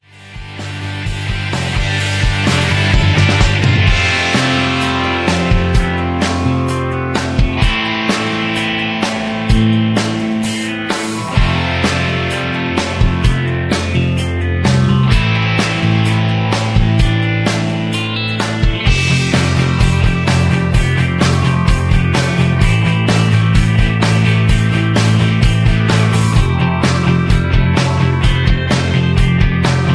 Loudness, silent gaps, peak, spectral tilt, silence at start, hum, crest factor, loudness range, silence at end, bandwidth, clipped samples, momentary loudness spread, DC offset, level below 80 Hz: -14 LUFS; none; 0 dBFS; -5.5 dB/octave; 0.2 s; none; 12 dB; 3 LU; 0 s; 11 kHz; under 0.1%; 5 LU; under 0.1%; -22 dBFS